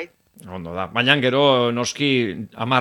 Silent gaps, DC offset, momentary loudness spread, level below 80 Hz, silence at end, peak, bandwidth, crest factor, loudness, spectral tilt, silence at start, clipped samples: none; under 0.1%; 17 LU; -58 dBFS; 0 s; 0 dBFS; 17 kHz; 20 dB; -19 LUFS; -4.5 dB/octave; 0 s; under 0.1%